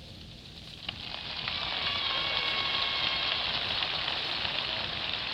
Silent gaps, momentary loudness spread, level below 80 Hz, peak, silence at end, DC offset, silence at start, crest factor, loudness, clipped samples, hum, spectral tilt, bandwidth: none; 12 LU; -54 dBFS; -12 dBFS; 0 s; under 0.1%; 0 s; 20 dB; -29 LUFS; under 0.1%; 60 Hz at -55 dBFS; -3 dB/octave; 16 kHz